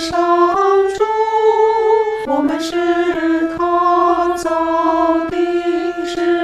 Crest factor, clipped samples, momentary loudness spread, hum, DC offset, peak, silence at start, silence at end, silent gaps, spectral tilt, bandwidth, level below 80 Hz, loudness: 12 dB; under 0.1%; 5 LU; none; under 0.1%; -2 dBFS; 0 s; 0 s; none; -4.5 dB/octave; 12.5 kHz; -48 dBFS; -15 LUFS